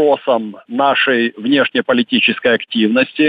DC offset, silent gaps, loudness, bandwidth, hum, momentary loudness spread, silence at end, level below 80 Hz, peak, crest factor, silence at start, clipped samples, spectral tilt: under 0.1%; none; -14 LUFS; 5 kHz; none; 5 LU; 0 s; -62 dBFS; -2 dBFS; 12 dB; 0 s; under 0.1%; -7 dB/octave